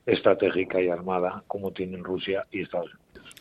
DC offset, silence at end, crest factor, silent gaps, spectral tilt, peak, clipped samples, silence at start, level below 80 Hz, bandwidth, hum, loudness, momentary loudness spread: under 0.1%; 0.1 s; 22 dB; none; -7 dB/octave; -6 dBFS; under 0.1%; 0.05 s; -64 dBFS; 13.5 kHz; none; -27 LUFS; 11 LU